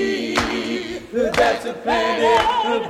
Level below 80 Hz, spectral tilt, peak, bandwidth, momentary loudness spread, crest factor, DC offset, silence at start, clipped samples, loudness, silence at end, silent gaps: -44 dBFS; -3.5 dB/octave; -2 dBFS; 15.5 kHz; 9 LU; 18 dB; under 0.1%; 0 s; under 0.1%; -19 LUFS; 0 s; none